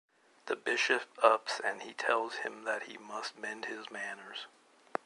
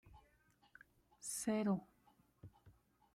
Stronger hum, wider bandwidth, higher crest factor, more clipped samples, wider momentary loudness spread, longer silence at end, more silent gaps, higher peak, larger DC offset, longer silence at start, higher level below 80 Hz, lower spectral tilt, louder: neither; second, 11.5 kHz vs 16 kHz; first, 26 dB vs 20 dB; neither; second, 15 LU vs 25 LU; first, 0.6 s vs 0.45 s; neither; first, -8 dBFS vs -26 dBFS; neither; first, 0.45 s vs 0.05 s; second, -88 dBFS vs -76 dBFS; second, -1.5 dB/octave vs -5 dB/octave; first, -34 LUFS vs -41 LUFS